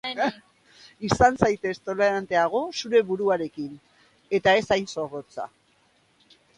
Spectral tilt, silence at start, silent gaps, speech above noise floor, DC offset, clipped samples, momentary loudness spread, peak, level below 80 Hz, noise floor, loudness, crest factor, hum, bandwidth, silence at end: -5 dB/octave; 0.05 s; none; 40 dB; under 0.1%; under 0.1%; 15 LU; 0 dBFS; -50 dBFS; -64 dBFS; -24 LUFS; 24 dB; none; 11 kHz; 1.1 s